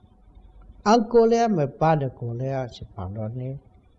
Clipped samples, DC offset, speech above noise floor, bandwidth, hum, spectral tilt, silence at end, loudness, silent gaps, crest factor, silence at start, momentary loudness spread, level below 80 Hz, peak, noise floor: under 0.1%; under 0.1%; 28 dB; 7.6 kHz; none; -7 dB/octave; 0.4 s; -23 LUFS; none; 18 dB; 0.6 s; 17 LU; -52 dBFS; -6 dBFS; -51 dBFS